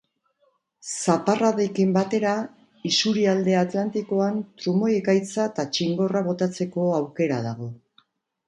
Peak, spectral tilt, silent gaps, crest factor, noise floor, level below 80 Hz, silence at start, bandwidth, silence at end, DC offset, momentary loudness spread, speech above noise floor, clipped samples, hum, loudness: -4 dBFS; -5.5 dB/octave; none; 18 dB; -68 dBFS; -68 dBFS; 0.85 s; 11.5 kHz; 0.7 s; under 0.1%; 8 LU; 45 dB; under 0.1%; none; -23 LUFS